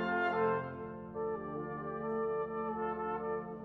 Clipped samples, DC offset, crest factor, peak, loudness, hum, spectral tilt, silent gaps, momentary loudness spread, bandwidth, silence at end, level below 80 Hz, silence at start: under 0.1%; under 0.1%; 16 dB; -22 dBFS; -37 LUFS; none; -8.5 dB/octave; none; 8 LU; 4.9 kHz; 0 s; -64 dBFS; 0 s